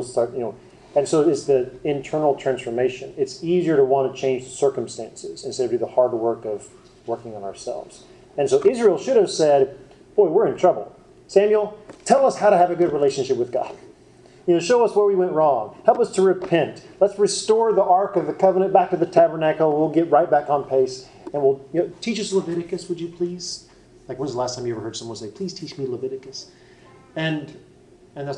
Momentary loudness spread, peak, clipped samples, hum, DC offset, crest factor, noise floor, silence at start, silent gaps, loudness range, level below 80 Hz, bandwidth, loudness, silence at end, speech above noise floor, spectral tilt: 14 LU; -2 dBFS; under 0.1%; none; under 0.1%; 20 dB; -50 dBFS; 0 s; none; 10 LU; -60 dBFS; 10.5 kHz; -21 LUFS; 0 s; 30 dB; -5.5 dB/octave